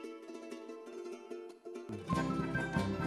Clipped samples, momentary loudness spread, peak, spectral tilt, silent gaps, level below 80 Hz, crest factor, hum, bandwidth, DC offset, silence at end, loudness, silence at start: under 0.1%; 13 LU; -20 dBFS; -6.5 dB/octave; none; -58 dBFS; 18 dB; none; 13 kHz; under 0.1%; 0 s; -40 LUFS; 0 s